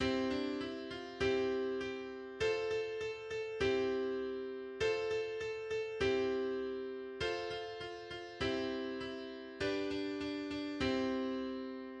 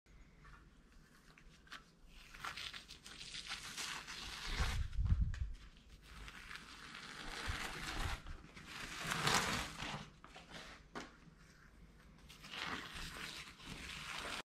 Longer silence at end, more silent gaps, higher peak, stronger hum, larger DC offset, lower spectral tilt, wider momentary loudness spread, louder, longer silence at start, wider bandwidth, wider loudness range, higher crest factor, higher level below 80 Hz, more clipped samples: about the same, 0 s vs 0.05 s; neither; second, -22 dBFS vs -16 dBFS; neither; neither; first, -5 dB/octave vs -3 dB/octave; second, 9 LU vs 23 LU; first, -38 LUFS vs -44 LUFS; about the same, 0 s vs 0.05 s; second, 9.4 kHz vs 16 kHz; second, 3 LU vs 9 LU; second, 16 dB vs 30 dB; second, -60 dBFS vs -50 dBFS; neither